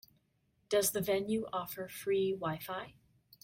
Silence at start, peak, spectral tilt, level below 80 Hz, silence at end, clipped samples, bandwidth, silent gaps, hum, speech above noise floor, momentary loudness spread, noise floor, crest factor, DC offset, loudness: 0.7 s; -18 dBFS; -4 dB/octave; -68 dBFS; 0.55 s; under 0.1%; 16.5 kHz; none; none; 41 dB; 11 LU; -76 dBFS; 18 dB; under 0.1%; -35 LUFS